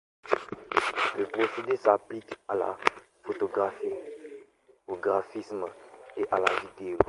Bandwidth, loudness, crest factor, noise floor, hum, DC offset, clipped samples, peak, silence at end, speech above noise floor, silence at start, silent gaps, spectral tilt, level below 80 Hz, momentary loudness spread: 11.5 kHz; -30 LUFS; 28 dB; -58 dBFS; none; under 0.1%; under 0.1%; -2 dBFS; 0 s; 28 dB; 0.25 s; none; -4.5 dB/octave; -60 dBFS; 16 LU